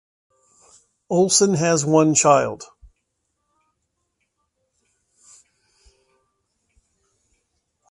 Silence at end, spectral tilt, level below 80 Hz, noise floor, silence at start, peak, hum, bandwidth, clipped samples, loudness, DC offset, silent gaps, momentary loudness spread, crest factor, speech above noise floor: 5.25 s; -4 dB/octave; -62 dBFS; -75 dBFS; 1.1 s; -2 dBFS; none; 11.5 kHz; under 0.1%; -17 LUFS; under 0.1%; none; 10 LU; 22 dB; 58 dB